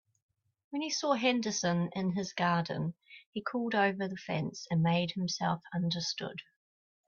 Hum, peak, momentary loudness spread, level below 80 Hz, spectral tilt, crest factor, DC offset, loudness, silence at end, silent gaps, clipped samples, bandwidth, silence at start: none; -16 dBFS; 10 LU; -72 dBFS; -5 dB/octave; 18 dB; under 0.1%; -33 LUFS; 0.7 s; 3.26-3.33 s; under 0.1%; 7.2 kHz; 0.7 s